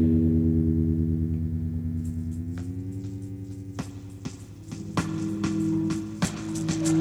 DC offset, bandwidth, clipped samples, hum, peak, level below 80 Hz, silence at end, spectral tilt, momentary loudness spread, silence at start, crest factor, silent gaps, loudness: under 0.1%; 14 kHz; under 0.1%; none; -12 dBFS; -42 dBFS; 0 s; -7 dB/octave; 15 LU; 0 s; 16 dB; none; -28 LUFS